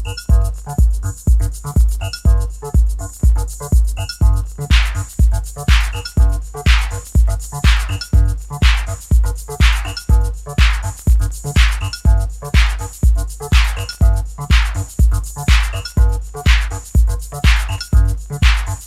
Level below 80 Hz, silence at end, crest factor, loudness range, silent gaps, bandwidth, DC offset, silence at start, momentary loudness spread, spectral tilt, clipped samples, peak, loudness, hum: -16 dBFS; 0 s; 14 dB; 1 LU; none; 14 kHz; under 0.1%; 0 s; 5 LU; -4.5 dB/octave; under 0.1%; 0 dBFS; -17 LUFS; none